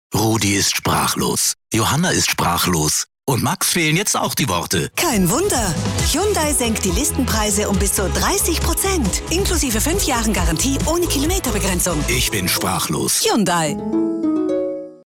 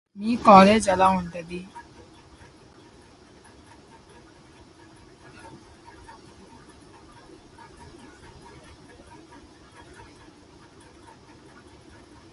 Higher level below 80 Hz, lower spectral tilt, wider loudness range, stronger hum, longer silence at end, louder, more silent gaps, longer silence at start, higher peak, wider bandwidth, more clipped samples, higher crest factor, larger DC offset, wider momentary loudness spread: first, -28 dBFS vs -54 dBFS; second, -3.5 dB/octave vs -5.5 dB/octave; second, 1 LU vs 28 LU; neither; second, 0.1 s vs 10.55 s; about the same, -17 LUFS vs -18 LUFS; neither; about the same, 0.1 s vs 0.15 s; second, -8 dBFS vs -2 dBFS; first, 17.5 kHz vs 11.5 kHz; neither; second, 10 dB vs 26 dB; neither; second, 4 LU vs 33 LU